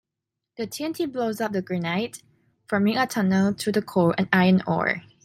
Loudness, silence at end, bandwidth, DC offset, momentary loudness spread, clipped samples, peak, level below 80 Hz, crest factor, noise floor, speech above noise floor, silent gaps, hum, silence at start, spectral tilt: -24 LUFS; 0.25 s; 15.5 kHz; under 0.1%; 10 LU; under 0.1%; -4 dBFS; -62 dBFS; 20 dB; -85 dBFS; 62 dB; none; none; 0.6 s; -6 dB/octave